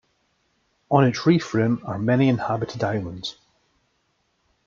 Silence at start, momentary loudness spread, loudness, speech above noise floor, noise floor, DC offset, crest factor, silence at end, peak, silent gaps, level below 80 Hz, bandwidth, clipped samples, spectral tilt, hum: 0.9 s; 11 LU; -22 LUFS; 48 dB; -70 dBFS; under 0.1%; 22 dB; 1.35 s; -2 dBFS; none; -60 dBFS; 7.4 kHz; under 0.1%; -7 dB/octave; none